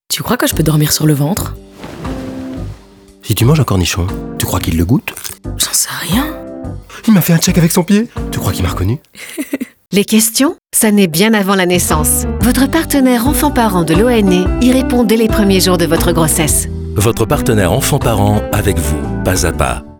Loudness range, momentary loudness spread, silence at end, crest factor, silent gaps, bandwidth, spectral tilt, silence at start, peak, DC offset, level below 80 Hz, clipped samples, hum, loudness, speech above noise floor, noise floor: 5 LU; 14 LU; 0.05 s; 12 dB; none; over 20 kHz; -4.5 dB/octave; 0.1 s; 0 dBFS; under 0.1%; -26 dBFS; under 0.1%; none; -12 LUFS; 28 dB; -40 dBFS